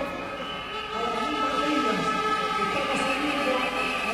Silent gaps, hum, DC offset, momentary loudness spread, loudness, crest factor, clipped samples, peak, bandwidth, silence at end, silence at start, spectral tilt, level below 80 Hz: none; none; under 0.1%; 8 LU; -26 LUFS; 14 dB; under 0.1%; -12 dBFS; 16 kHz; 0 s; 0 s; -3.5 dB/octave; -52 dBFS